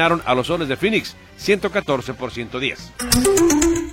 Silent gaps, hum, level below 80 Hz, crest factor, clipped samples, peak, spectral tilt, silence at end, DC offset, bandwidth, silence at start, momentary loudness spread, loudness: none; none; -38 dBFS; 20 dB; under 0.1%; 0 dBFS; -3.5 dB/octave; 0 s; under 0.1%; 16.5 kHz; 0 s; 13 LU; -19 LUFS